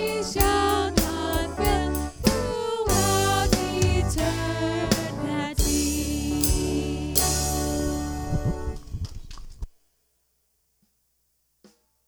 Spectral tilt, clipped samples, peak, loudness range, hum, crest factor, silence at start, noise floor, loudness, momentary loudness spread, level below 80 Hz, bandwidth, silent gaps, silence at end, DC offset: -4 dB/octave; under 0.1%; 0 dBFS; 12 LU; none; 24 dB; 0 s; -71 dBFS; -24 LUFS; 14 LU; -32 dBFS; over 20 kHz; none; 2.4 s; under 0.1%